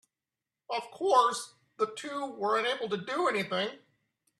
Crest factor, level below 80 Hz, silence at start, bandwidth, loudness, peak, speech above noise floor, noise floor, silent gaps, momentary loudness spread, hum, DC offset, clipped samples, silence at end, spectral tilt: 20 dB; -82 dBFS; 0.7 s; 13 kHz; -30 LUFS; -12 dBFS; over 60 dB; under -90 dBFS; none; 12 LU; none; under 0.1%; under 0.1%; 0.6 s; -3.5 dB/octave